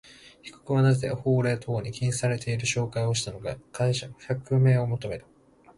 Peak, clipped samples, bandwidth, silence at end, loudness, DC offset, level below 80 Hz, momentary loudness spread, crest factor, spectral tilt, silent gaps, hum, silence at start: -12 dBFS; under 0.1%; 11.5 kHz; 0.55 s; -27 LUFS; under 0.1%; -56 dBFS; 14 LU; 14 dB; -5.5 dB/octave; none; none; 0.25 s